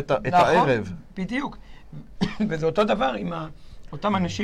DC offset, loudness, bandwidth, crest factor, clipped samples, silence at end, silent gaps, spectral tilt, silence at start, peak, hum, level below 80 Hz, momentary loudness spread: 0.2%; -23 LUFS; 11.5 kHz; 14 dB; under 0.1%; 0 s; none; -6 dB/octave; 0 s; -10 dBFS; none; -46 dBFS; 21 LU